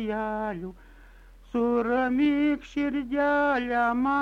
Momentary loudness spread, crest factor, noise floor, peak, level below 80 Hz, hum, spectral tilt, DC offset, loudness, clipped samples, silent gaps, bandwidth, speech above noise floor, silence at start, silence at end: 9 LU; 12 dB; -50 dBFS; -14 dBFS; -52 dBFS; none; -6.5 dB/octave; under 0.1%; -26 LUFS; under 0.1%; none; 7 kHz; 25 dB; 0 s; 0 s